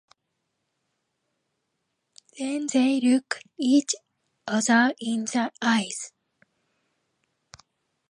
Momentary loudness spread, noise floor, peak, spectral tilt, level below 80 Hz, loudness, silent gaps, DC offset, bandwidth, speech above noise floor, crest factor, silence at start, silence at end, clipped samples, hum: 13 LU; -79 dBFS; -8 dBFS; -3 dB/octave; -76 dBFS; -24 LUFS; none; under 0.1%; 11.5 kHz; 55 dB; 20 dB; 2.35 s; 2 s; under 0.1%; none